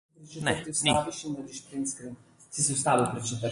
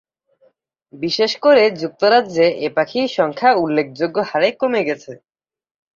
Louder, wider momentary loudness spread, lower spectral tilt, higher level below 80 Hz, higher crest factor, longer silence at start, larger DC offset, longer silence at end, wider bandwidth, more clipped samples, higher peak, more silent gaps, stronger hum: second, -28 LUFS vs -17 LUFS; first, 14 LU vs 8 LU; second, -3 dB/octave vs -5 dB/octave; first, -58 dBFS vs -64 dBFS; about the same, 20 dB vs 16 dB; second, 0.2 s vs 0.95 s; neither; second, 0 s vs 0.8 s; first, 11.5 kHz vs 7.4 kHz; neither; second, -10 dBFS vs -2 dBFS; neither; neither